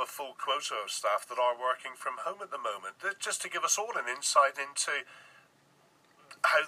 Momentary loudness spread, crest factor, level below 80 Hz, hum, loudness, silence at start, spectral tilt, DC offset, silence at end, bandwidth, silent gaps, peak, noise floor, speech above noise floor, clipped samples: 11 LU; 22 dB; under -90 dBFS; none; -31 LUFS; 0 s; 1.5 dB/octave; under 0.1%; 0 s; 15.5 kHz; none; -12 dBFS; -65 dBFS; 32 dB; under 0.1%